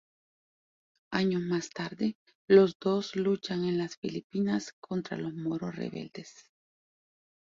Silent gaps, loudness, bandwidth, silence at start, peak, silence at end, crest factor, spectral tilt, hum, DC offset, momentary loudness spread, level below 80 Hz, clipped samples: 2.15-2.26 s, 2.35-2.48 s, 2.75-2.80 s, 3.97-4.02 s, 4.24-4.30 s, 4.73-4.82 s; -30 LUFS; 7.6 kHz; 1.1 s; -10 dBFS; 1.1 s; 22 dB; -6.5 dB/octave; none; under 0.1%; 15 LU; -70 dBFS; under 0.1%